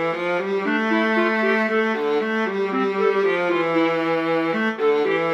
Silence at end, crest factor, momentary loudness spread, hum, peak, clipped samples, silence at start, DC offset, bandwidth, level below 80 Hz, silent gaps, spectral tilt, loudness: 0 s; 12 dB; 3 LU; none; -8 dBFS; under 0.1%; 0 s; under 0.1%; 9 kHz; -74 dBFS; none; -6 dB/octave; -20 LUFS